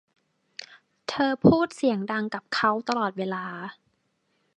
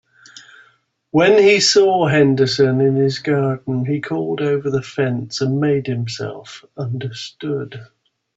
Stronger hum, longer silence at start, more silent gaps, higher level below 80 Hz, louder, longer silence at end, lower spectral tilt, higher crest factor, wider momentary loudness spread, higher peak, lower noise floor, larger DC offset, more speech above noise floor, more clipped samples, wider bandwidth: neither; first, 0.6 s vs 0.35 s; neither; about the same, -58 dBFS vs -58 dBFS; second, -25 LUFS vs -17 LUFS; first, 0.85 s vs 0.55 s; about the same, -6 dB/octave vs -5 dB/octave; first, 22 dB vs 14 dB; first, 22 LU vs 16 LU; second, -6 dBFS vs -2 dBFS; first, -72 dBFS vs -58 dBFS; neither; first, 48 dB vs 41 dB; neither; first, 10.5 kHz vs 8 kHz